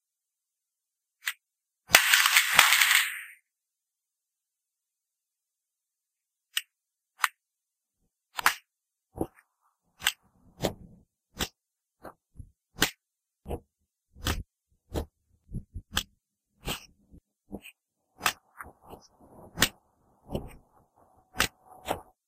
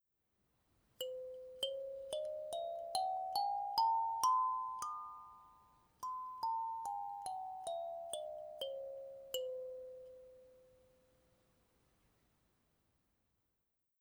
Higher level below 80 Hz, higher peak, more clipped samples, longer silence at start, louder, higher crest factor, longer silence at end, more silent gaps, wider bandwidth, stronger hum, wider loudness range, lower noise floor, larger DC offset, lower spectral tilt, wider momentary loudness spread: first, -50 dBFS vs -80 dBFS; first, 0 dBFS vs -22 dBFS; neither; first, 1.25 s vs 1 s; first, -26 LUFS vs -41 LUFS; first, 32 dB vs 22 dB; second, 0.25 s vs 3.4 s; neither; second, 15.5 kHz vs over 20 kHz; neither; first, 16 LU vs 12 LU; about the same, -87 dBFS vs -86 dBFS; neither; about the same, -1 dB/octave vs -1 dB/octave; first, 27 LU vs 16 LU